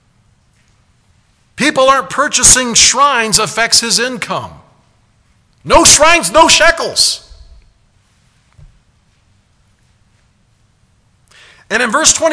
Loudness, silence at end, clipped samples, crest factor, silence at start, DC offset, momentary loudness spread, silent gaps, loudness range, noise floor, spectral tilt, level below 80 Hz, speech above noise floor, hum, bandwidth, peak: -9 LUFS; 0 s; 0.5%; 14 dB; 1.6 s; under 0.1%; 12 LU; none; 9 LU; -54 dBFS; -0.5 dB/octave; -36 dBFS; 44 dB; none; 11 kHz; 0 dBFS